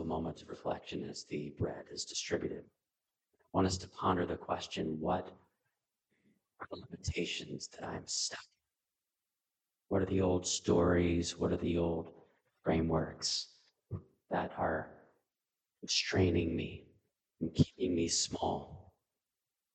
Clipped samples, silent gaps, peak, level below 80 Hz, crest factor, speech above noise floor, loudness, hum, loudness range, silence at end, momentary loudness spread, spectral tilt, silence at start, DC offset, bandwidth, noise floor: under 0.1%; none; -14 dBFS; -56 dBFS; 24 dB; over 55 dB; -35 LUFS; none; 8 LU; 0.95 s; 17 LU; -4.5 dB/octave; 0 s; under 0.1%; 9.4 kHz; under -90 dBFS